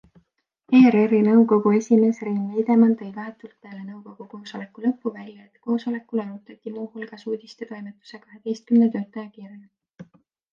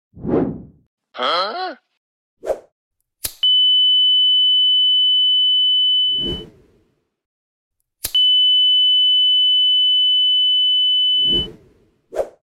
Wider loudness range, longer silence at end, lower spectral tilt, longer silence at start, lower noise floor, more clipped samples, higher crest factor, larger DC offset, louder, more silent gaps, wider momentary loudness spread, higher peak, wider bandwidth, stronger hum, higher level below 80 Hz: first, 12 LU vs 6 LU; first, 0.5 s vs 0.3 s; first, -7.5 dB/octave vs -2.5 dB/octave; first, 0.7 s vs 0.15 s; first, -68 dBFS vs -62 dBFS; neither; first, 18 dB vs 10 dB; neither; second, -20 LUFS vs -12 LUFS; second, none vs 0.86-0.98 s, 1.97-2.37 s, 2.72-2.91 s, 7.26-7.71 s; first, 23 LU vs 17 LU; about the same, -4 dBFS vs -6 dBFS; second, 7 kHz vs 16.5 kHz; neither; second, -74 dBFS vs -48 dBFS